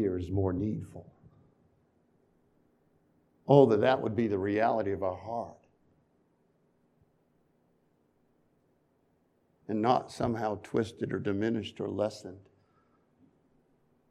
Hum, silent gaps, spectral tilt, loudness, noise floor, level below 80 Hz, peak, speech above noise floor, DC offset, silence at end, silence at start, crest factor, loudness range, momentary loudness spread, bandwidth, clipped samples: none; none; -7.5 dB/octave; -30 LUFS; -71 dBFS; -64 dBFS; -6 dBFS; 42 dB; under 0.1%; 1.7 s; 0 s; 26 dB; 11 LU; 20 LU; 11 kHz; under 0.1%